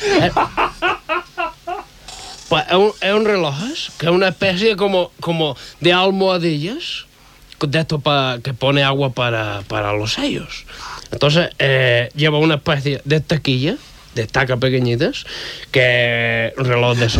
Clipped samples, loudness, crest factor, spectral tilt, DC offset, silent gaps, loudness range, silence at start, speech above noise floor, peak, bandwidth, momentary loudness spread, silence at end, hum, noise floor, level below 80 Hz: under 0.1%; -17 LUFS; 14 dB; -5.5 dB/octave; under 0.1%; none; 2 LU; 0 s; 27 dB; -2 dBFS; 15.5 kHz; 13 LU; 0 s; none; -44 dBFS; -44 dBFS